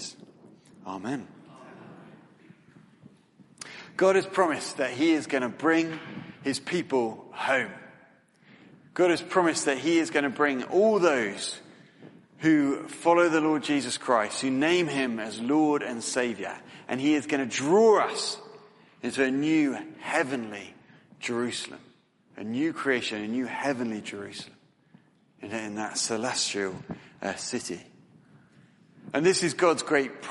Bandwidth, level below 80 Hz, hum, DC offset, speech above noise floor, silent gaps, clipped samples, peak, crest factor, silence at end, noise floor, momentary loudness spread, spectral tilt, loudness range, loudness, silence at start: 11.5 kHz; -74 dBFS; none; under 0.1%; 34 dB; none; under 0.1%; -6 dBFS; 20 dB; 0 s; -60 dBFS; 16 LU; -4 dB/octave; 7 LU; -27 LUFS; 0 s